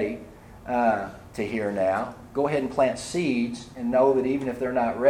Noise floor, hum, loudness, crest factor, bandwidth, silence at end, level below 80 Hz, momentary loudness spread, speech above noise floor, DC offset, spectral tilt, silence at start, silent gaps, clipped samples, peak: -44 dBFS; none; -26 LUFS; 16 dB; 14 kHz; 0 s; -54 dBFS; 11 LU; 20 dB; under 0.1%; -6 dB/octave; 0 s; none; under 0.1%; -8 dBFS